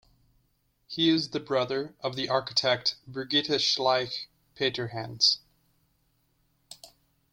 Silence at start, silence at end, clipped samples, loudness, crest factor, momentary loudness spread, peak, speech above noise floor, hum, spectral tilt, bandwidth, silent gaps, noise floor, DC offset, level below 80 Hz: 0.9 s; 0.45 s; under 0.1%; -27 LUFS; 22 dB; 15 LU; -8 dBFS; 43 dB; none; -3.5 dB/octave; 16 kHz; none; -71 dBFS; under 0.1%; -68 dBFS